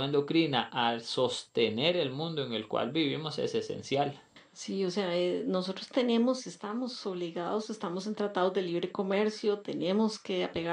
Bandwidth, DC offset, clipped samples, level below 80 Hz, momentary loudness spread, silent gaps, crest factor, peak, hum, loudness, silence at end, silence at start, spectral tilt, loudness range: 10.5 kHz; under 0.1%; under 0.1%; -76 dBFS; 8 LU; none; 18 dB; -12 dBFS; none; -31 LUFS; 0 s; 0 s; -5 dB/octave; 2 LU